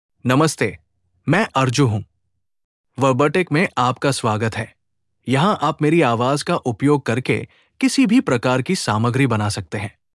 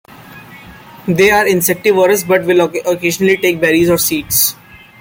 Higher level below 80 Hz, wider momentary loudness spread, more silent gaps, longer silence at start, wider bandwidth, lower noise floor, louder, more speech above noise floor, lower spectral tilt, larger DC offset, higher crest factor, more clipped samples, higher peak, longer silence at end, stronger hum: second, -58 dBFS vs -46 dBFS; first, 10 LU vs 5 LU; first, 2.64-2.84 s vs none; about the same, 0.25 s vs 0.2 s; second, 12 kHz vs 17 kHz; first, -74 dBFS vs -36 dBFS; second, -19 LUFS vs -12 LUFS; first, 56 dB vs 24 dB; first, -5.5 dB/octave vs -4 dB/octave; neither; about the same, 16 dB vs 14 dB; neither; second, -4 dBFS vs 0 dBFS; second, 0.25 s vs 0.45 s; neither